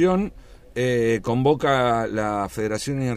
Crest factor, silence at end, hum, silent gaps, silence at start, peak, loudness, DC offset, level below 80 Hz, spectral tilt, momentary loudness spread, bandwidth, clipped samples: 14 dB; 0 s; none; none; 0 s; -8 dBFS; -22 LUFS; under 0.1%; -46 dBFS; -6 dB/octave; 7 LU; 15.5 kHz; under 0.1%